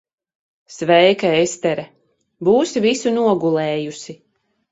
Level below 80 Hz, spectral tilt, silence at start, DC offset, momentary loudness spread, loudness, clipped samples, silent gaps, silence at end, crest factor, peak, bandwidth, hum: -62 dBFS; -4.5 dB/octave; 0.7 s; under 0.1%; 14 LU; -17 LUFS; under 0.1%; none; 0.55 s; 18 dB; 0 dBFS; 8 kHz; none